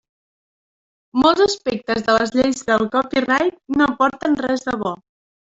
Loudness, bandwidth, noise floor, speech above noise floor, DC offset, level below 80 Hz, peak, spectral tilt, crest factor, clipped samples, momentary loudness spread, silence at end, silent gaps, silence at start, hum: -18 LUFS; 8 kHz; under -90 dBFS; over 72 dB; under 0.1%; -52 dBFS; -2 dBFS; -4 dB/octave; 16 dB; under 0.1%; 8 LU; 0.45 s; none; 1.15 s; none